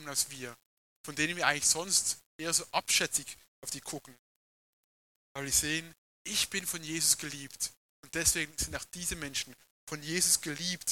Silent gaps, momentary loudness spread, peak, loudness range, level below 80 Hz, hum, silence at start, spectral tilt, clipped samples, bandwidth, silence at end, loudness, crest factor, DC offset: 0.66-1.04 s, 2.26-2.39 s, 3.48-3.62 s, 4.19-5.35 s, 5.98-6.25 s, 7.77-8.03 s, 9.70-9.87 s; 17 LU; -8 dBFS; 4 LU; -58 dBFS; none; 0 s; -1 dB/octave; under 0.1%; 17.5 kHz; 0 s; -30 LUFS; 26 dB; under 0.1%